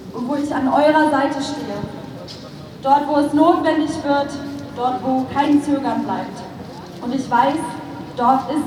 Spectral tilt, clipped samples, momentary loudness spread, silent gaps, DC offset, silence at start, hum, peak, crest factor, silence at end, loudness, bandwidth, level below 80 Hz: -5.5 dB/octave; under 0.1%; 18 LU; none; under 0.1%; 0 s; none; -2 dBFS; 16 dB; 0 s; -18 LUFS; 13 kHz; -54 dBFS